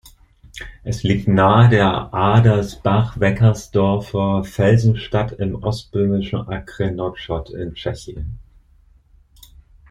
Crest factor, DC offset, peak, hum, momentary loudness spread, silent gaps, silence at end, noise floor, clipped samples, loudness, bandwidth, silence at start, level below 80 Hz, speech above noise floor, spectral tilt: 16 dB; under 0.1%; -2 dBFS; none; 16 LU; none; 1.5 s; -52 dBFS; under 0.1%; -18 LUFS; 10.5 kHz; 0.55 s; -38 dBFS; 35 dB; -7.5 dB/octave